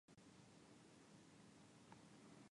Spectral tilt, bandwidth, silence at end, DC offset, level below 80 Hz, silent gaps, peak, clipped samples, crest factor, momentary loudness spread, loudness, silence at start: -4.5 dB/octave; 11 kHz; 0 s; under 0.1%; -90 dBFS; none; -50 dBFS; under 0.1%; 18 dB; 2 LU; -66 LUFS; 0.1 s